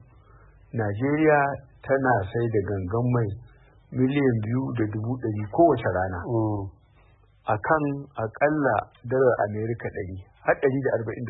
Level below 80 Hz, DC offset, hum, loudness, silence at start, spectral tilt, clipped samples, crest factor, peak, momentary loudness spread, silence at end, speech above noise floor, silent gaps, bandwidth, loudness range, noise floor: -54 dBFS; under 0.1%; none; -25 LUFS; 0.75 s; -12.5 dB/octave; under 0.1%; 18 dB; -8 dBFS; 12 LU; 0 s; 33 dB; none; 4 kHz; 2 LU; -57 dBFS